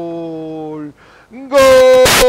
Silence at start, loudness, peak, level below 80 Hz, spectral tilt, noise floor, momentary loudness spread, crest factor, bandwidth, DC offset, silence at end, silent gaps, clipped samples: 0 s; -8 LUFS; 0 dBFS; -34 dBFS; -2.5 dB/octave; -38 dBFS; 20 LU; 12 dB; 16.5 kHz; under 0.1%; 0 s; none; under 0.1%